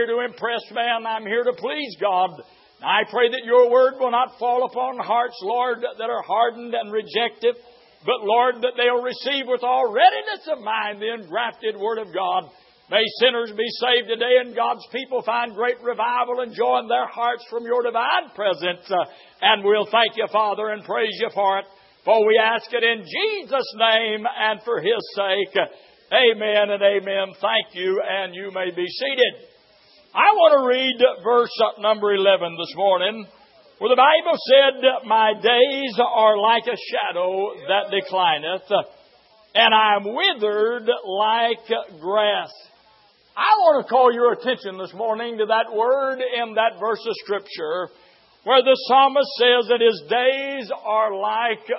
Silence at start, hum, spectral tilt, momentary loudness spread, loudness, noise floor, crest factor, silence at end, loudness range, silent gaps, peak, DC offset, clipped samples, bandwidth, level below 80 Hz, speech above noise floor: 0 s; none; -7 dB/octave; 10 LU; -20 LUFS; -56 dBFS; 18 dB; 0 s; 5 LU; none; -2 dBFS; under 0.1%; under 0.1%; 5.8 kHz; -80 dBFS; 36 dB